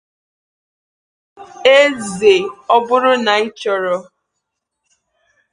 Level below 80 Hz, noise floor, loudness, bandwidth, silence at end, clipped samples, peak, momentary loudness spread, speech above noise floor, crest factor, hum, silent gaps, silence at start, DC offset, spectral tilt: -60 dBFS; -76 dBFS; -14 LUFS; 10.5 kHz; 1.5 s; under 0.1%; 0 dBFS; 9 LU; 62 dB; 18 dB; none; none; 1.4 s; under 0.1%; -3 dB/octave